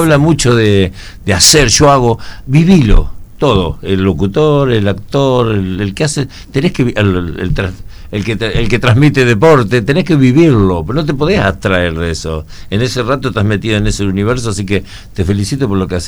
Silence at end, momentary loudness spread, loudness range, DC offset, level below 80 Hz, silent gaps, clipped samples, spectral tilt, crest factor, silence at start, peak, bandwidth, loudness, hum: 0 s; 10 LU; 5 LU; under 0.1%; -22 dBFS; none; 0.6%; -5 dB/octave; 10 dB; 0 s; 0 dBFS; over 20 kHz; -11 LUFS; none